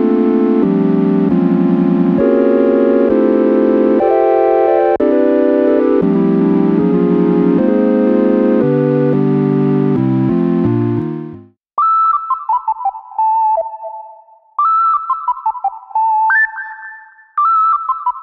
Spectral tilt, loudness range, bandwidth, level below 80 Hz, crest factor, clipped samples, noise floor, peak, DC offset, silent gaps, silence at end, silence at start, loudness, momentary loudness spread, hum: -11 dB/octave; 4 LU; 5 kHz; -50 dBFS; 12 dB; under 0.1%; -41 dBFS; 0 dBFS; under 0.1%; none; 0 s; 0 s; -13 LUFS; 8 LU; none